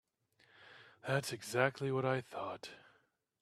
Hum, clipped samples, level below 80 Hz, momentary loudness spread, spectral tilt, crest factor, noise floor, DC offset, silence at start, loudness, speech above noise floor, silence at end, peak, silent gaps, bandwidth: none; under 0.1%; -78 dBFS; 22 LU; -5 dB/octave; 26 dB; -75 dBFS; under 0.1%; 0.6 s; -37 LUFS; 38 dB; 0.65 s; -14 dBFS; none; 14.5 kHz